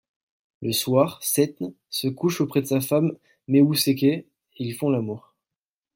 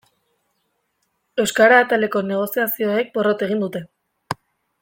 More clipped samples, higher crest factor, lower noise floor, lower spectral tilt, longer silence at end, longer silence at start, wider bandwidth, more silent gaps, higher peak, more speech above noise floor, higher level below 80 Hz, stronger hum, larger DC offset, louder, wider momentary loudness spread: neither; about the same, 18 dB vs 20 dB; first, under -90 dBFS vs -71 dBFS; about the same, -5 dB/octave vs -4.5 dB/octave; first, 0.75 s vs 0.5 s; second, 0.6 s vs 1.35 s; about the same, 17 kHz vs 17 kHz; neither; second, -6 dBFS vs -2 dBFS; first, over 67 dB vs 53 dB; about the same, -66 dBFS vs -64 dBFS; neither; neither; second, -23 LUFS vs -18 LUFS; second, 13 LU vs 19 LU